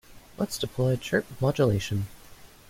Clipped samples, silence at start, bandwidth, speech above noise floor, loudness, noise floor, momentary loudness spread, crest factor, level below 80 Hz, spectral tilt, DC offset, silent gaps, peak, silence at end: under 0.1%; 0.1 s; 16.5 kHz; 23 dB; -27 LUFS; -49 dBFS; 8 LU; 18 dB; -52 dBFS; -6 dB/octave; under 0.1%; none; -10 dBFS; 0.25 s